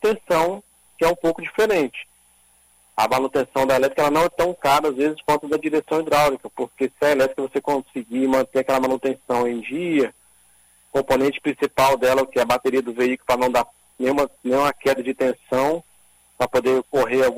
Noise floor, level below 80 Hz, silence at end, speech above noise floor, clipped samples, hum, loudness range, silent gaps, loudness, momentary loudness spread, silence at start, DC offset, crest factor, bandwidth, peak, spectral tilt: -57 dBFS; -52 dBFS; 0 s; 37 dB; under 0.1%; 60 Hz at -65 dBFS; 3 LU; none; -21 LUFS; 7 LU; 0 s; under 0.1%; 14 dB; 16 kHz; -6 dBFS; -4.5 dB/octave